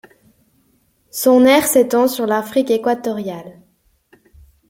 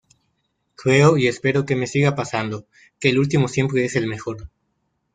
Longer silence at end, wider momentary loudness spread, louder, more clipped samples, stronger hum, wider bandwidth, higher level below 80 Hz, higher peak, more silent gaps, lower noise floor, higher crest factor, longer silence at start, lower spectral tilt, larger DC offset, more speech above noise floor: first, 1.2 s vs 0.65 s; about the same, 16 LU vs 14 LU; first, -15 LUFS vs -20 LUFS; neither; neither; first, 16.5 kHz vs 9.4 kHz; second, -58 dBFS vs -52 dBFS; about the same, -2 dBFS vs -2 dBFS; neither; second, -60 dBFS vs -71 dBFS; about the same, 16 dB vs 18 dB; first, 1.15 s vs 0.8 s; second, -3.5 dB/octave vs -6 dB/octave; neither; second, 45 dB vs 52 dB